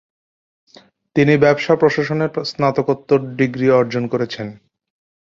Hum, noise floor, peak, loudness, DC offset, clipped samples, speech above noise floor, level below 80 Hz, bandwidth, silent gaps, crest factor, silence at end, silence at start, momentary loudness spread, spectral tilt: none; under -90 dBFS; -2 dBFS; -17 LUFS; under 0.1%; under 0.1%; over 74 dB; -56 dBFS; 7.4 kHz; none; 16 dB; 0.7 s; 1.15 s; 9 LU; -7 dB/octave